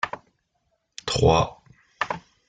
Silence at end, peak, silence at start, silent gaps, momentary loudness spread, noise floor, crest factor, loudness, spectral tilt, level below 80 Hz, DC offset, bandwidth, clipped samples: 0.3 s; -6 dBFS; 0.05 s; none; 19 LU; -73 dBFS; 20 dB; -24 LUFS; -5 dB/octave; -44 dBFS; under 0.1%; 9.4 kHz; under 0.1%